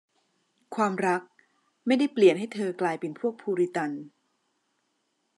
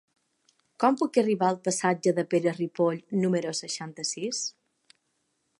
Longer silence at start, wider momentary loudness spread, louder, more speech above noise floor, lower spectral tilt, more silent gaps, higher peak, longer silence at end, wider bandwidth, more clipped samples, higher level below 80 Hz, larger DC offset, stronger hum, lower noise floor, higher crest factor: about the same, 0.7 s vs 0.8 s; first, 12 LU vs 7 LU; about the same, -27 LUFS vs -27 LUFS; about the same, 50 dB vs 49 dB; first, -6 dB/octave vs -4.5 dB/octave; neither; about the same, -8 dBFS vs -8 dBFS; first, 1.3 s vs 1.1 s; about the same, 11.5 kHz vs 11.5 kHz; neither; second, -88 dBFS vs -80 dBFS; neither; neither; about the same, -75 dBFS vs -76 dBFS; about the same, 22 dB vs 20 dB